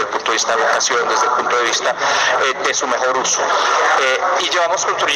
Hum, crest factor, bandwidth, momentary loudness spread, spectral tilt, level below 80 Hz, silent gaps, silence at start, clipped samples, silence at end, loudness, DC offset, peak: none; 12 dB; 14.5 kHz; 3 LU; 0 dB/octave; -62 dBFS; none; 0 s; under 0.1%; 0 s; -15 LUFS; under 0.1%; -4 dBFS